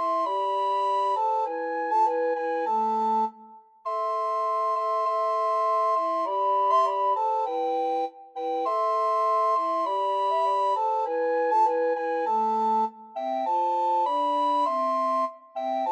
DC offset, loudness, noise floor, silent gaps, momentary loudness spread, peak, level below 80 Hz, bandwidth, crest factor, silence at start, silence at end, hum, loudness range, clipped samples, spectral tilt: under 0.1%; -25 LUFS; -50 dBFS; none; 6 LU; -12 dBFS; under -90 dBFS; 9 kHz; 14 dB; 0 s; 0 s; none; 2 LU; under 0.1%; -4 dB/octave